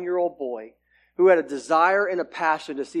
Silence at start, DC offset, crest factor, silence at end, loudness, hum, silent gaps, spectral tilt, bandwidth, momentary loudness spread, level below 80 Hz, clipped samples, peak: 0 s; under 0.1%; 18 dB; 0 s; -22 LUFS; 60 Hz at -65 dBFS; none; -5 dB/octave; 10.5 kHz; 14 LU; -72 dBFS; under 0.1%; -6 dBFS